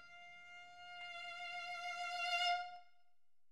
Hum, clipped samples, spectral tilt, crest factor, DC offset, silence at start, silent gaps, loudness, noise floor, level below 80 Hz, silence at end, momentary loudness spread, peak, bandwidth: none; under 0.1%; 1 dB/octave; 20 dB; under 0.1%; 0 s; none; -42 LUFS; -86 dBFS; -88 dBFS; 0.65 s; 19 LU; -26 dBFS; 14 kHz